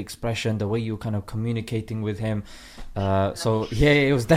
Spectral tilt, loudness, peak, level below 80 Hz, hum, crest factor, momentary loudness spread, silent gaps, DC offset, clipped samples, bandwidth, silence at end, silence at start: -6 dB/octave; -25 LUFS; -4 dBFS; -40 dBFS; none; 20 dB; 11 LU; none; under 0.1%; under 0.1%; 15.5 kHz; 0 s; 0 s